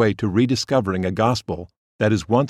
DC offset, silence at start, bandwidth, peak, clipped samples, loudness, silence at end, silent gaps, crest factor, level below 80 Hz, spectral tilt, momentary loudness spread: under 0.1%; 0 s; 13.5 kHz; -4 dBFS; under 0.1%; -21 LUFS; 0 s; 1.77-1.99 s; 16 dB; -48 dBFS; -6 dB/octave; 7 LU